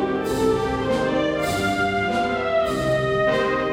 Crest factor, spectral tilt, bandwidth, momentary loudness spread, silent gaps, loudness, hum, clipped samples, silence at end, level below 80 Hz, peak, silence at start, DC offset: 14 dB; -5.5 dB/octave; 16.5 kHz; 2 LU; none; -22 LUFS; none; under 0.1%; 0 s; -42 dBFS; -8 dBFS; 0 s; under 0.1%